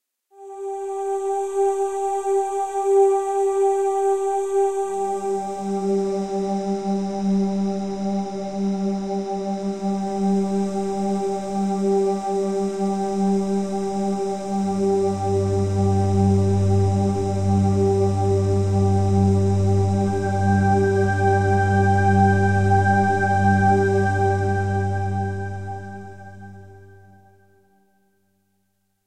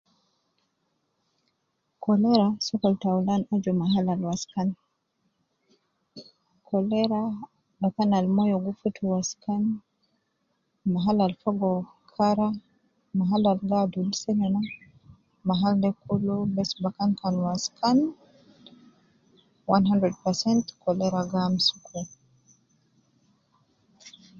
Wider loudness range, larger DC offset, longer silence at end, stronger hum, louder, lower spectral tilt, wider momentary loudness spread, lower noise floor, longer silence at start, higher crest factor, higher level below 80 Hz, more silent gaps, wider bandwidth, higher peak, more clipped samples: about the same, 6 LU vs 4 LU; first, 0.7% vs under 0.1%; second, 0 s vs 0.3 s; neither; first, -21 LUFS vs -26 LUFS; first, -7.5 dB/octave vs -6 dB/octave; about the same, 8 LU vs 9 LU; second, -71 dBFS vs -76 dBFS; second, 0 s vs 2 s; second, 14 dB vs 20 dB; first, -48 dBFS vs -64 dBFS; neither; first, 9.6 kHz vs 7.6 kHz; about the same, -6 dBFS vs -8 dBFS; neither